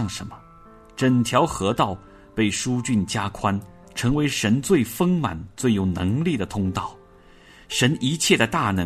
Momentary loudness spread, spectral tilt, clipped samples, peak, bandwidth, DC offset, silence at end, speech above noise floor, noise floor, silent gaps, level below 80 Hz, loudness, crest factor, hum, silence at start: 11 LU; -5 dB/octave; under 0.1%; -4 dBFS; 13.5 kHz; under 0.1%; 0 s; 28 dB; -50 dBFS; none; -48 dBFS; -22 LUFS; 20 dB; none; 0 s